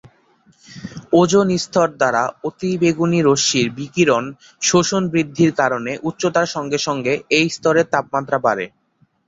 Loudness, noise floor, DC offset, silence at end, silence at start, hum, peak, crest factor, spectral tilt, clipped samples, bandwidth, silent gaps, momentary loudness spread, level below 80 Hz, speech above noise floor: -18 LUFS; -60 dBFS; under 0.1%; 0.6 s; 0.7 s; none; -2 dBFS; 16 dB; -4.5 dB/octave; under 0.1%; 8 kHz; none; 9 LU; -56 dBFS; 43 dB